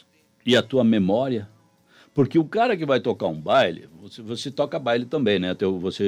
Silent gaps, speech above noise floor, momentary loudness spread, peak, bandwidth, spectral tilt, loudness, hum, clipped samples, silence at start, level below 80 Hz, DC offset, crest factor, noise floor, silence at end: none; 34 dB; 12 LU; -6 dBFS; 12 kHz; -6 dB/octave; -22 LUFS; none; under 0.1%; 0.45 s; -64 dBFS; under 0.1%; 16 dB; -56 dBFS; 0 s